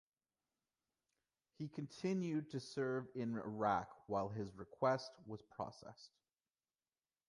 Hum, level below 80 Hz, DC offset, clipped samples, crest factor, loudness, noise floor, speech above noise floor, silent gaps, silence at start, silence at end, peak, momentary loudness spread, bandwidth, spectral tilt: none; -76 dBFS; under 0.1%; under 0.1%; 22 dB; -43 LUFS; under -90 dBFS; over 47 dB; none; 1.6 s; 1.2 s; -24 dBFS; 14 LU; 11 kHz; -6.5 dB/octave